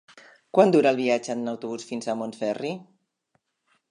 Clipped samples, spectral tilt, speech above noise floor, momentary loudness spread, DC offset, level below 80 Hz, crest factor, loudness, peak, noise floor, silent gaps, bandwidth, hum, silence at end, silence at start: under 0.1%; -5.5 dB/octave; 49 dB; 14 LU; under 0.1%; -78 dBFS; 22 dB; -24 LUFS; -4 dBFS; -73 dBFS; none; 11 kHz; none; 1.05 s; 0.55 s